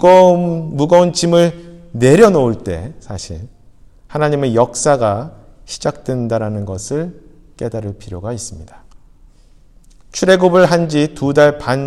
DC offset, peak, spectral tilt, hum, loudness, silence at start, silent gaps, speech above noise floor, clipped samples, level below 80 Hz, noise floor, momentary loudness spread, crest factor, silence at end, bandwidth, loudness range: under 0.1%; 0 dBFS; -5.5 dB/octave; none; -14 LUFS; 0 s; none; 31 dB; 0.1%; -42 dBFS; -45 dBFS; 19 LU; 14 dB; 0 s; 13 kHz; 11 LU